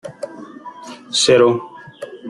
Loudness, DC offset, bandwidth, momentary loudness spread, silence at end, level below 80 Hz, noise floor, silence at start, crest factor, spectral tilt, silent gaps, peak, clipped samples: -15 LUFS; under 0.1%; 11.5 kHz; 24 LU; 0 s; -60 dBFS; -36 dBFS; 0.05 s; 18 dB; -3.5 dB/octave; none; -2 dBFS; under 0.1%